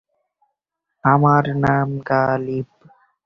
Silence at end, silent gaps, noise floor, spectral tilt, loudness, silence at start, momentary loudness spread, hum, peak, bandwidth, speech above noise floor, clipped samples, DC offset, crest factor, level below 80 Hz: 0.6 s; none; -79 dBFS; -9.5 dB/octave; -18 LUFS; 1.05 s; 12 LU; none; -2 dBFS; 6 kHz; 62 dB; under 0.1%; under 0.1%; 18 dB; -50 dBFS